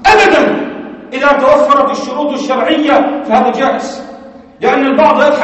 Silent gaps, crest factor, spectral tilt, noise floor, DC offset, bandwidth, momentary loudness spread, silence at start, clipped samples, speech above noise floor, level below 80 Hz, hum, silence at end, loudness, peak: none; 10 dB; -4.5 dB/octave; -33 dBFS; under 0.1%; 8.4 kHz; 15 LU; 0 s; 0.4%; 23 dB; -42 dBFS; none; 0 s; -10 LUFS; 0 dBFS